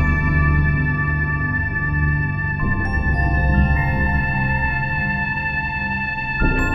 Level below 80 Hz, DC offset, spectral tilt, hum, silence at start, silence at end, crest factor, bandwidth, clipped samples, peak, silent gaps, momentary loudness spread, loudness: -24 dBFS; under 0.1%; -8.5 dB/octave; none; 0 s; 0 s; 14 dB; 7.8 kHz; under 0.1%; -4 dBFS; none; 4 LU; -19 LUFS